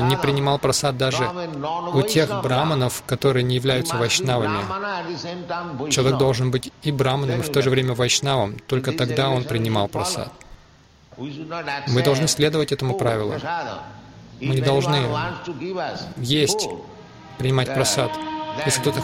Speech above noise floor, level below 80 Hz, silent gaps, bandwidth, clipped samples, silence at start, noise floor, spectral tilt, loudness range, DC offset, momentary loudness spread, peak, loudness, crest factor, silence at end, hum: 30 dB; -50 dBFS; none; 16.5 kHz; under 0.1%; 0 s; -51 dBFS; -4.5 dB/octave; 3 LU; under 0.1%; 10 LU; -4 dBFS; -22 LUFS; 18 dB; 0 s; none